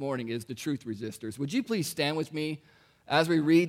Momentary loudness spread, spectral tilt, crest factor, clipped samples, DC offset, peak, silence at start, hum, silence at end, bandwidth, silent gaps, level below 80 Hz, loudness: 12 LU; -5.5 dB/octave; 20 dB; under 0.1%; under 0.1%; -10 dBFS; 0 s; none; 0 s; 16 kHz; none; -72 dBFS; -30 LUFS